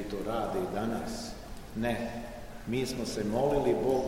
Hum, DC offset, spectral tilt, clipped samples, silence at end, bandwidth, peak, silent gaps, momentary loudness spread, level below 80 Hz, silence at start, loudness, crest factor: none; 0.2%; -5.5 dB/octave; under 0.1%; 0 s; 16 kHz; -16 dBFS; none; 14 LU; -48 dBFS; 0 s; -33 LUFS; 16 dB